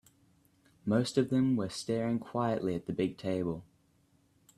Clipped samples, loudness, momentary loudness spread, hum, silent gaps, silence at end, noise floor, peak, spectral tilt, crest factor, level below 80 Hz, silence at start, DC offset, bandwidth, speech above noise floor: under 0.1%; -32 LUFS; 6 LU; none; none; 0.95 s; -69 dBFS; -14 dBFS; -6.5 dB/octave; 20 dB; -66 dBFS; 0.85 s; under 0.1%; 13 kHz; 38 dB